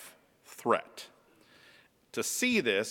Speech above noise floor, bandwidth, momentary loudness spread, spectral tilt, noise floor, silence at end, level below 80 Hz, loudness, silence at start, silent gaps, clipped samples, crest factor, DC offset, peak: 32 dB; 19 kHz; 24 LU; -2.5 dB/octave; -62 dBFS; 0 s; -76 dBFS; -30 LUFS; 0 s; none; under 0.1%; 22 dB; under 0.1%; -12 dBFS